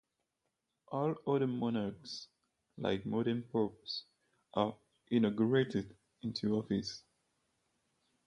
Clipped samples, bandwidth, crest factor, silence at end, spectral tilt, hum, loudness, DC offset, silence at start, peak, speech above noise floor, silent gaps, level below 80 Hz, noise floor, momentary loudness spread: under 0.1%; 10 kHz; 22 dB; 1.25 s; -7 dB/octave; none; -36 LUFS; under 0.1%; 0.9 s; -16 dBFS; 51 dB; none; -70 dBFS; -86 dBFS; 13 LU